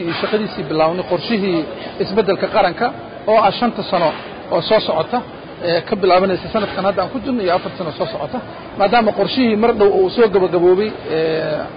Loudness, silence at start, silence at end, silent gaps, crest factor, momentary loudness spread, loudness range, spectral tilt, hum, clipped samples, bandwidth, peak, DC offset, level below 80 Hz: -17 LUFS; 0 s; 0 s; none; 14 dB; 10 LU; 3 LU; -11 dB/octave; none; under 0.1%; 5.2 kHz; -2 dBFS; under 0.1%; -46 dBFS